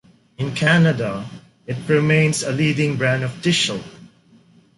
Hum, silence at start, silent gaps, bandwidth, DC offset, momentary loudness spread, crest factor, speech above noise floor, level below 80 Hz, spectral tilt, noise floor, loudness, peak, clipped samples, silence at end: none; 0.4 s; none; 11.5 kHz; under 0.1%; 16 LU; 16 dB; 34 dB; -56 dBFS; -5 dB/octave; -52 dBFS; -19 LUFS; -4 dBFS; under 0.1%; 0.7 s